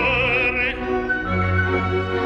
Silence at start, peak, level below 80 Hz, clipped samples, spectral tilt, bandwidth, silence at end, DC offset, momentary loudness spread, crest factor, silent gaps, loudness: 0 s; -8 dBFS; -36 dBFS; under 0.1%; -7 dB/octave; 7.2 kHz; 0 s; under 0.1%; 5 LU; 12 dB; none; -20 LUFS